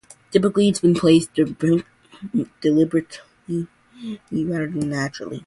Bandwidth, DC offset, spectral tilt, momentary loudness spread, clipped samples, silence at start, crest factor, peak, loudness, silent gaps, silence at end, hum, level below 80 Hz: 11.5 kHz; under 0.1%; -6.5 dB/octave; 18 LU; under 0.1%; 0.3 s; 18 dB; -2 dBFS; -21 LUFS; none; 0.05 s; none; -56 dBFS